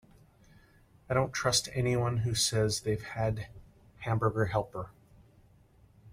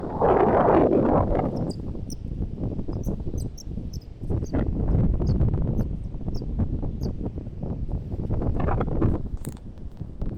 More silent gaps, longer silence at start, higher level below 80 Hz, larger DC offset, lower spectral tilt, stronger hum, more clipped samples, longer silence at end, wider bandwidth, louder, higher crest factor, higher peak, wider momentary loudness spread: neither; first, 1.1 s vs 0 s; second, -54 dBFS vs -30 dBFS; neither; second, -4 dB/octave vs -9 dB/octave; neither; neither; about the same, 0 s vs 0 s; first, 16 kHz vs 13.5 kHz; second, -31 LUFS vs -26 LUFS; about the same, 20 dB vs 16 dB; second, -12 dBFS vs -8 dBFS; about the same, 14 LU vs 16 LU